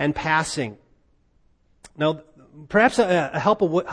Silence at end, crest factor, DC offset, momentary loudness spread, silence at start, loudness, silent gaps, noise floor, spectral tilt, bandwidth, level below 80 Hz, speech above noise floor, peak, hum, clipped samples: 0 s; 20 dB; under 0.1%; 11 LU; 0 s; -21 LUFS; none; -61 dBFS; -5 dB/octave; 10.5 kHz; -52 dBFS; 40 dB; -4 dBFS; none; under 0.1%